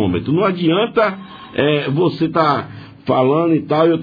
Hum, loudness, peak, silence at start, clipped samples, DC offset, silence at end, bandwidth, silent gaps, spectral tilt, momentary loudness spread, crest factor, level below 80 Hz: none; -16 LUFS; 0 dBFS; 0 s; under 0.1%; under 0.1%; 0 s; 5 kHz; none; -9 dB/octave; 9 LU; 16 dB; -52 dBFS